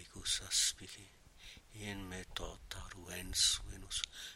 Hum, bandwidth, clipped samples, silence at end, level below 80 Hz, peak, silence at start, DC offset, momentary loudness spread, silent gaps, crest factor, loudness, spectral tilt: none; 16 kHz; under 0.1%; 0 s; -54 dBFS; -16 dBFS; 0 s; under 0.1%; 22 LU; none; 26 dB; -36 LUFS; -0.5 dB/octave